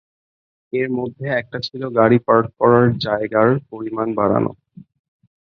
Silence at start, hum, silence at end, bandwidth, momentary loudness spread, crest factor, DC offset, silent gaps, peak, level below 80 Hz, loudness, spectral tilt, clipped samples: 0.75 s; none; 0.95 s; 6.4 kHz; 12 LU; 18 dB; under 0.1%; none; -2 dBFS; -54 dBFS; -18 LUFS; -8.5 dB/octave; under 0.1%